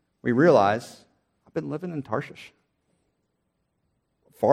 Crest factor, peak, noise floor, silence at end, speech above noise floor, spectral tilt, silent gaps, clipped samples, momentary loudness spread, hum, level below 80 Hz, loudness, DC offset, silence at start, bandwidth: 22 dB; -4 dBFS; -75 dBFS; 0 s; 52 dB; -7 dB/octave; none; under 0.1%; 17 LU; none; -70 dBFS; -24 LUFS; under 0.1%; 0.25 s; 14 kHz